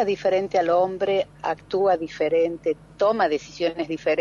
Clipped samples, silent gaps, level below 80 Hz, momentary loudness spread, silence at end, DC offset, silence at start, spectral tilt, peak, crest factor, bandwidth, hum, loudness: under 0.1%; none; -58 dBFS; 6 LU; 0 s; under 0.1%; 0 s; -5.5 dB/octave; -10 dBFS; 12 dB; 7.4 kHz; none; -23 LUFS